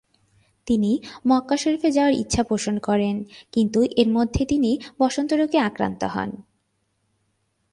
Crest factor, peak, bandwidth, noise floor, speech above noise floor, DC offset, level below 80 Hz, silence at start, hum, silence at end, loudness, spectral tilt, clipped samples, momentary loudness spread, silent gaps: 20 dB; -4 dBFS; 11.5 kHz; -71 dBFS; 50 dB; under 0.1%; -46 dBFS; 0.65 s; none; 1.3 s; -22 LUFS; -5.5 dB/octave; under 0.1%; 7 LU; none